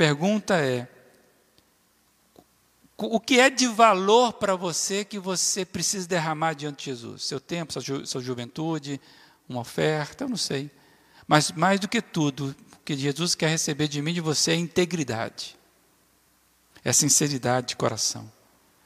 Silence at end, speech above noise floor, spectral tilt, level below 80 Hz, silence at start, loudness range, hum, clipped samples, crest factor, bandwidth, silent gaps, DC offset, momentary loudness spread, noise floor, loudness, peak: 0.55 s; 40 dB; -3.5 dB/octave; -66 dBFS; 0 s; 8 LU; none; under 0.1%; 22 dB; 15.5 kHz; none; under 0.1%; 15 LU; -64 dBFS; -24 LUFS; -4 dBFS